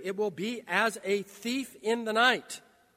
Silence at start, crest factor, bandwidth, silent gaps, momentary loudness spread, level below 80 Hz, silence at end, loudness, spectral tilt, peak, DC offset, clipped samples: 0 s; 20 dB; 16 kHz; none; 10 LU; -80 dBFS; 0.35 s; -29 LUFS; -3 dB/octave; -10 dBFS; under 0.1%; under 0.1%